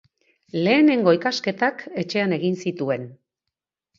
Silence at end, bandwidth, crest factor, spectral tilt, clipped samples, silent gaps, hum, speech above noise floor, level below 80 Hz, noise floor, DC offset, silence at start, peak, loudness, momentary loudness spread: 0.85 s; 7.6 kHz; 18 dB; -6 dB/octave; under 0.1%; none; none; 64 dB; -70 dBFS; -84 dBFS; under 0.1%; 0.55 s; -4 dBFS; -21 LUFS; 13 LU